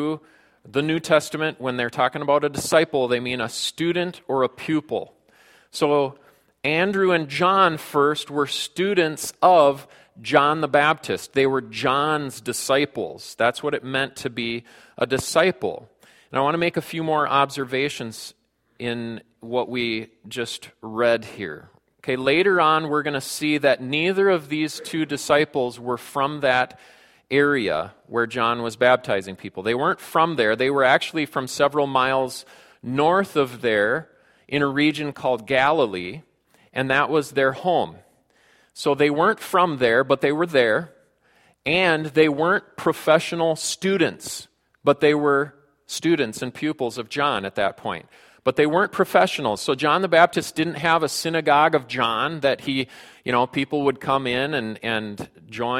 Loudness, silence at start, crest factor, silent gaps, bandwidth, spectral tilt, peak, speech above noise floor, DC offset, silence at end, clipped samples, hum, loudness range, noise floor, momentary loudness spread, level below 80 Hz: -21 LUFS; 0 s; 22 dB; none; 16.5 kHz; -4.5 dB/octave; 0 dBFS; 38 dB; under 0.1%; 0 s; under 0.1%; none; 5 LU; -60 dBFS; 12 LU; -62 dBFS